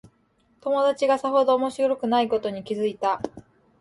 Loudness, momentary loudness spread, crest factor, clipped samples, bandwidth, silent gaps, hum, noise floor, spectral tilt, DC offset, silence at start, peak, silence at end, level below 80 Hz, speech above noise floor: -23 LUFS; 9 LU; 14 dB; under 0.1%; 11.5 kHz; none; none; -64 dBFS; -5 dB/octave; under 0.1%; 0.65 s; -10 dBFS; 0.4 s; -64 dBFS; 42 dB